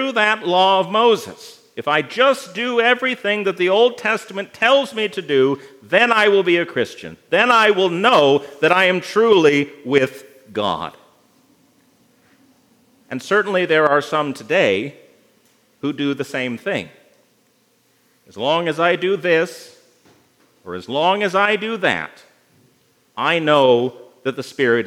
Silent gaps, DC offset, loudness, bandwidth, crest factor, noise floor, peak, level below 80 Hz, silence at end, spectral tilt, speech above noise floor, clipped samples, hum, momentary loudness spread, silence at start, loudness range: none; under 0.1%; -17 LUFS; 15.5 kHz; 18 dB; -60 dBFS; 0 dBFS; -72 dBFS; 0 s; -4.5 dB/octave; 43 dB; under 0.1%; none; 14 LU; 0 s; 9 LU